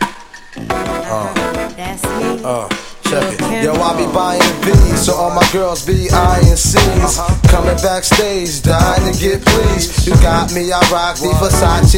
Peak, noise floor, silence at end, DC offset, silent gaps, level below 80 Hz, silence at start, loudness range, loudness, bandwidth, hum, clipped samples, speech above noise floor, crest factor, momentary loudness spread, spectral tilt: 0 dBFS; -32 dBFS; 0 s; under 0.1%; none; -18 dBFS; 0 s; 6 LU; -13 LUFS; 17 kHz; none; 0.2%; 21 dB; 12 dB; 9 LU; -4.5 dB/octave